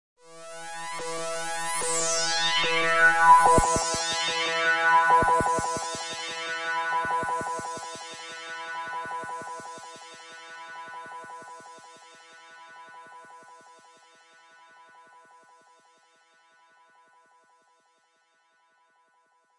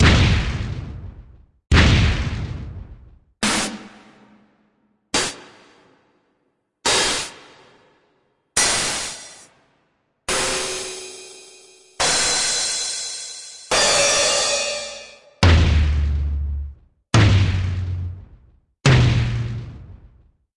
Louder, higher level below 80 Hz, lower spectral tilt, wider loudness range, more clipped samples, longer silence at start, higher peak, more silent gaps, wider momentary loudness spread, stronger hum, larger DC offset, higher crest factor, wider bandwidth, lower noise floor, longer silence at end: second, -24 LUFS vs -19 LUFS; second, -50 dBFS vs -30 dBFS; second, -1.5 dB/octave vs -3.5 dB/octave; first, 23 LU vs 8 LU; neither; first, 0.3 s vs 0 s; second, -6 dBFS vs 0 dBFS; neither; first, 24 LU vs 20 LU; neither; neither; about the same, 22 dB vs 20 dB; about the same, 11.5 kHz vs 11.5 kHz; about the same, -68 dBFS vs -70 dBFS; first, 4 s vs 0.6 s